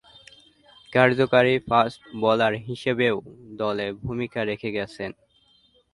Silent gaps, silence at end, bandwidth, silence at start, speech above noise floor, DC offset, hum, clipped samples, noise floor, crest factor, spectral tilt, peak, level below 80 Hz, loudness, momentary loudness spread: none; 0.8 s; 11.5 kHz; 0.9 s; 38 dB; under 0.1%; none; under 0.1%; -61 dBFS; 22 dB; -6.5 dB/octave; -2 dBFS; -56 dBFS; -23 LUFS; 12 LU